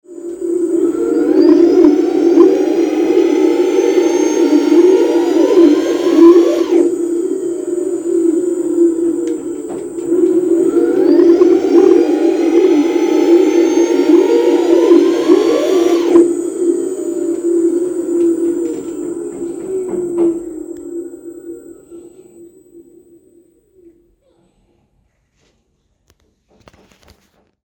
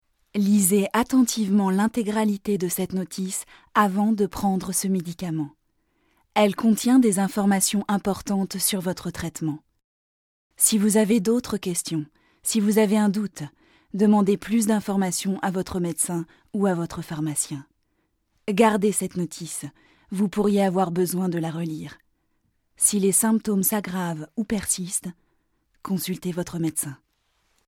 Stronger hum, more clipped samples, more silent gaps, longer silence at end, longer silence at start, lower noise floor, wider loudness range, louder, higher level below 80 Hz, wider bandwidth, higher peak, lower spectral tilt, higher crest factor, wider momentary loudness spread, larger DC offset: neither; neither; second, none vs 9.84-10.50 s; first, 4.85 s vs 0.75 s; second, 0.1 s vs 0.35 s; second, -62 dBFS vs -71 dBFS; first, 11 LU vs 4 LU; first, -12 LUFS vs -23 LUFS; about the same, -56 dBFS vs -56 dBFS; about the same, 16.5 kHz vs 16.5 kHz; first, 0 dBFS vs -4 dBFS; about the same, -5 dB/octave vs -4.5 dB/octave; second, 12 dB vs 20 dB; about the same, 14 LU vs 12 LU; neither